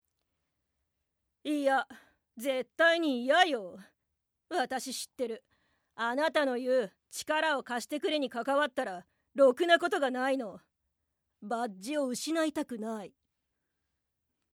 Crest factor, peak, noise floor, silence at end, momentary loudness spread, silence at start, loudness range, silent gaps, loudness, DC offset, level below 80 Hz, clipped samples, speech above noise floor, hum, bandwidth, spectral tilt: 22 dB; -10 dBFS; -82 dBFS; 1.45 s; 15 LU; 1.45 s; 6 LU; none; -31 LUFS; under 0.1%; -82 dBFS; under 0.1%; 52 dB; none; 16.5 kHz; -2.5 dB/octave